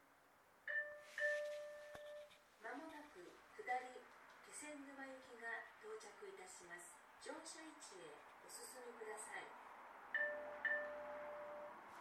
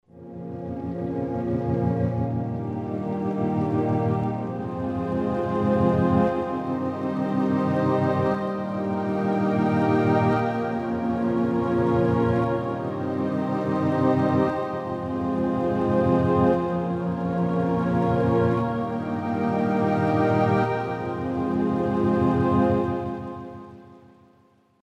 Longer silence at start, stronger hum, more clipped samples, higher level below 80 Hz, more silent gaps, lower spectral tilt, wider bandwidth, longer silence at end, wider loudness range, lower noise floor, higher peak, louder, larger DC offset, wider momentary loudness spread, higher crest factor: second, 0 s vs 0.15 s; neither; neither; second, -88 dBFS vs -50 dBFS; neither; second, -1.5 dB/octave vs -9.5 dB/octave; first, 18 kHz vs 9.2 kHz; second, 0 s vs 0.85 s; first, 7 LU vs 3 LU; first, -71 dBFS vs -60 dBFS; second, -32 dBFS vs -8 dBFS; second, -50 LUFS vs -24 LUFS; neither; first, 16 LU vs 8 LU; about the same, 20 dB vs 16 dB